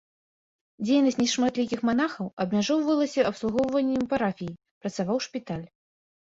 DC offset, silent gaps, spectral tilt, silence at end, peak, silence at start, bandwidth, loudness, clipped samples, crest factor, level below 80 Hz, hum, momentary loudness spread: under 0.1%; 2.33-2.37 s, 4.71-4.81 s; -5 dB/octave; 0.55 s; -10 dBFS; 0.8 s; 7.8 kHz; -26 LUFS; under 0.1%; 16 dB; -62 dBFS; none; 12 LU